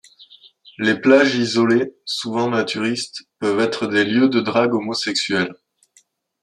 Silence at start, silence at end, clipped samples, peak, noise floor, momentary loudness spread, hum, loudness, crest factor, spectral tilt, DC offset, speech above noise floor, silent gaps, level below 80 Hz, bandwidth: 0.2 s; 0.9 s; under 0.1%; -2 dBFS; -58 dBFS; 10 LU; none; -19 LUFS; 18 dB; -4.5 dB/octave; under 0.1%; 40 dB; none; -66 dBFS; 11.5 kHz